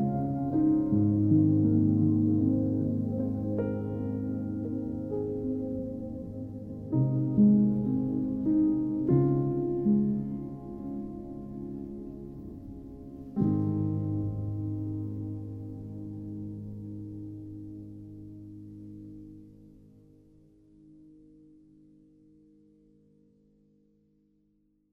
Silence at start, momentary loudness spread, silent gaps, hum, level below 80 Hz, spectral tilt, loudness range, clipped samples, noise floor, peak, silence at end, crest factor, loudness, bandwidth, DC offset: 0 s; 20 LU; none; none; -54 dBFS; -13 dB/octave; 18 LU; under 0.1%; -70 dBFS; -12 dBFS; 3.85 s; 18 dB; -29 LUFS; 2.2 kHz; under 0.1%